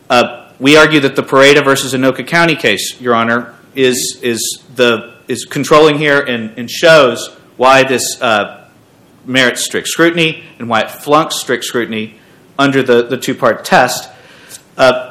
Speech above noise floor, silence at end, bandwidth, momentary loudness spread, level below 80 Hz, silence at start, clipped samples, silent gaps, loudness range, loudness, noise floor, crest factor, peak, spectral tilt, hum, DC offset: 34 dB; 0 s; 19 kHz; 13 LU; -50 dBFS; 0.1 s; 2%; none; 4 LU; -11 LUFS; -45 dBFS; 12 dB; 0 dBFS; -3.5 dB/octave; none; under 0.1%